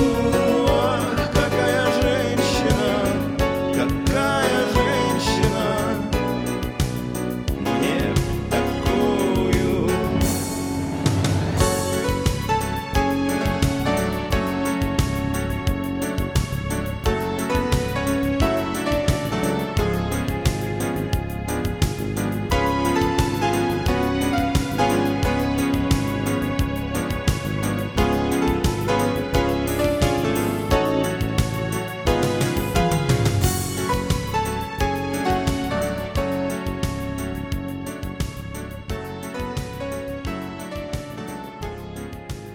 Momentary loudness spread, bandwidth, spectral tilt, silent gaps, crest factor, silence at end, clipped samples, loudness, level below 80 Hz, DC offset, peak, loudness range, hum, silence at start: 10 LU; over 20 kHz; -5.5 dB/octave; none; 18 dB; 0 s; under 0.1%; -22 LUFS; -32 dBFS; under 0.1%; -4 dBFS; 6 LU; none; 0 s